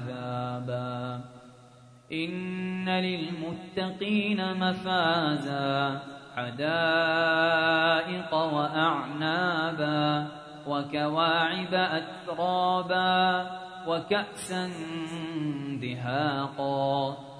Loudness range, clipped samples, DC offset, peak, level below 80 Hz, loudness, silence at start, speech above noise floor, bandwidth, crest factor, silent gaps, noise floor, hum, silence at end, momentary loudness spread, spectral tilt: 6 LU; under 0.1%; under 0.1%; -10 dBFS; -68 dBFS; -28 LUFS; 0 s; 26 dB; 11 kHz; 18 dB; none; -53 dBFS; none; 0 s; 11 LU; -5.5 dB/octave